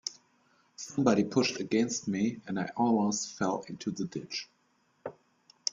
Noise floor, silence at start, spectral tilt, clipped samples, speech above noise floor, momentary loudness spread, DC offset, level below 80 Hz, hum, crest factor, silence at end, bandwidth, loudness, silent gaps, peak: -71 dBFS; 0.05 s; -4.5 dB/octave; under 0.1%; 41 dB; 18 LU; under 0.1%; -72 dBFS; none; 24 dB; 0 s; 7.6 kHz; -31 LUFS; none; -8 dBFS